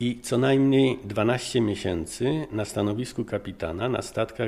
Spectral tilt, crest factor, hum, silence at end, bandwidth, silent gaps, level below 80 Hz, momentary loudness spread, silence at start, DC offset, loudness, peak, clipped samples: -6 dB/octave; 16 dB; none; 0 s; 14.5 kHz; none; -50 dBFS; 10 LU; 0 s; under 0.1%; -26 LUFS; -10 dBFS; under 0.1%